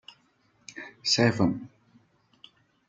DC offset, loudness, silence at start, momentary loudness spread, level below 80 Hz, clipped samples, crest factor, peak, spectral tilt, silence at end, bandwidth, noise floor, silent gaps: under 0.1%; -25 LUFS; 0.7 s; 22 LU; -66 dBFS; under 0.1%; 22 dB; -8 dBFS; -4.5 dB/octave; 1.2 s; 9.4 kHz; -67 dBFS; none